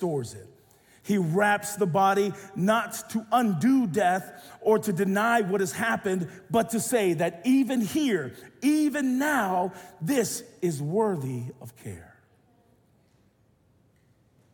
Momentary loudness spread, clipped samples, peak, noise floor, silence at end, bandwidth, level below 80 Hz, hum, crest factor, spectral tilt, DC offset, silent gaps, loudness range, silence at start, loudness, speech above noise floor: 13 LU; under 0.1%; -10 dBFS; -64 dBFS; 2.5 s; 18 kHz; -68 dBFS; none; 16 dB; -5.5 dB/octave; under 0.1%; none; 7 LU; 0 s; -26 LUFS; 39 dB